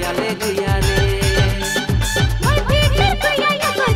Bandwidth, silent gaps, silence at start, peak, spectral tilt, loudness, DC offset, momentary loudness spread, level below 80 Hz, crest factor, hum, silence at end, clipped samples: 16.5 kHz; none; 0 s; -2 dBFS; -4.5 dB/octave; -17 LUFS; under 0.1%; 4 LU; -24 dBFS; 14 dB; none; 0 s; under 0.1%